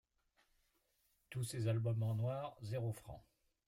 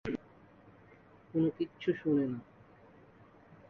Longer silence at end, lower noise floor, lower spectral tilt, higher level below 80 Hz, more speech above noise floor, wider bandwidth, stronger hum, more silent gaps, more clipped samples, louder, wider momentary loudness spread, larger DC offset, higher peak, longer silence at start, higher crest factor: first, 0.5 s vs 0.15 s; first, -80 dBFS vs -59 dBFS; second, -6.5 dB/octave vs -9 dB/octave; about the same, -70 dBFS vs -68 dBFS; first, 40 dB vs 27 dB; first, 15.5 kHz vs 6.4 kHz; neither; neither; neither; second, -42 LUFS vs -34 LUFS; about the same, 13 LU vs 11 LU; neither; second, -28 dBFS vs -18 dBFS; first, 1.3 s vs 0.05 s; about the same, 16 dB vs 18 dB